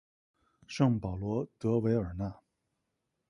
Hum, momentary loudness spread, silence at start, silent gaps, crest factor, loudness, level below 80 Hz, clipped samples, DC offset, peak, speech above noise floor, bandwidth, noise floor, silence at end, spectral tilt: none; 11 LU; 0.7 s; none; 20 dB; -32 LUFS; -54 dBFS; under 0.1%; under 0.1%; -14 dBFS; 52 dB; 11 kHz; -83 dBFS; 0.95 s; -8 dB/octave